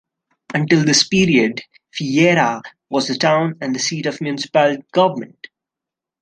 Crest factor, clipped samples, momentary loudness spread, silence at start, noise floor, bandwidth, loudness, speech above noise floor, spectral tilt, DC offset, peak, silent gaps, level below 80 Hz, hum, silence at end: 16 dB; under 0.1%; 13 LU; 0.5 s; -86 dBFS; 10 kHz; -17 LUFS; 69 dB; -4.5 dB/octave; under 0.1%; -2 dBFS; none; -56 dBFS; none; 0.95 s